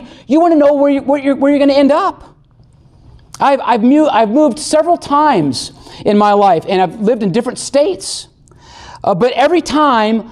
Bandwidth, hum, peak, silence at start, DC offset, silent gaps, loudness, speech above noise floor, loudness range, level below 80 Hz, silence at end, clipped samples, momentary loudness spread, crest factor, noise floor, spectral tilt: 12 kHz; none; -2 dBFS; 0 s; under 0.1%; none; -12 LUFS; 34 dB; 3 LU; -48 dBFS; 0 s; under 0.1%; 8 LU; 10 dB; -46 dBFS; -5 dB/octave